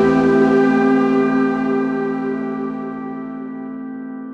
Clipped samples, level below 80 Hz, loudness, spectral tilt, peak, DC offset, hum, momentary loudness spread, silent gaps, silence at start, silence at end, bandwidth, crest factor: under 0.1%; -52 dBFS; -17 LUFS; -8 dB/octave; -4 dBFS; under 0.1%; none; 15 LU; none; 0 s; 0 s; 7.2 kHz; 14 dB